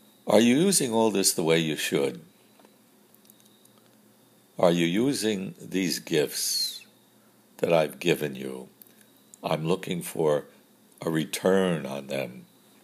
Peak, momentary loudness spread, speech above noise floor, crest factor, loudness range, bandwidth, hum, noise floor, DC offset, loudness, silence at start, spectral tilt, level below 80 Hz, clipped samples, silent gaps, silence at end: -6 dBFS; 12 LU; 34 dB; 22 dB; 5 LU; 15.5 kHz; none; -59 dBFS; under 0.1%; -26 LUFS; 0.25 s; -4 dB/octave; -70 dBFS; under 0.1%; none; 0.4 s